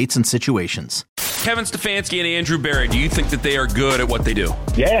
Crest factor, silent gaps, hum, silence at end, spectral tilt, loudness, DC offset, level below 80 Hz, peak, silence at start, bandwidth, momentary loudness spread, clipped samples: 14 dB; 1.09-1.16 s; none; 0 s; -4 dB/octave; -19 LUFS; under 0.1%; -26 dBFS; -6 dBFS; 0 s; 17 kHz; 4 LU; under 0.1%